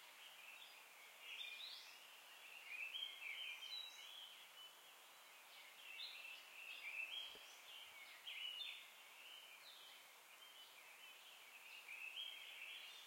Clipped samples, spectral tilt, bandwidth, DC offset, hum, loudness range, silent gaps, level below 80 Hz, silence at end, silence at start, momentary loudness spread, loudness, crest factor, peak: under 0.1%; 2.5 dB/octave; 16.5 kHz; under 0.1%; none; 4 LU; none; under -90 dBFS; 0 s; 0 s; 12 LU; -53 LUFS; 20 dB; -38 dBFS